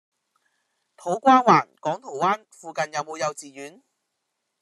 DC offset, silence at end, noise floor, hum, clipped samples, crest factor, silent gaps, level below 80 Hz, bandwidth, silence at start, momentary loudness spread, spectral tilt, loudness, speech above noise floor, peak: under 0.1%; 0.9 s; -79 dBFS; none; under 0.1%; 22 dB; none; -76 dBFS; 12.5 kHz; 1.05 s; 21 LU; -4.5 dB/octave; -22 LUFS; 56 dB; -2 dBFS